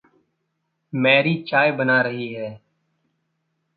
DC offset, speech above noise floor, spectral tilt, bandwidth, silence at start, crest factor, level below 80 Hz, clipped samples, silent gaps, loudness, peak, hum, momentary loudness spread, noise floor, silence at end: under 0.1%; 55 dB; -10 dB/octave; 5.2 kHz; 0.95 s; 20 dB; -70 dBFS; under 0.1%; none; -19 LUFS; -2 dBFS; none; 15 LU; -75 dBFS; 1.2 s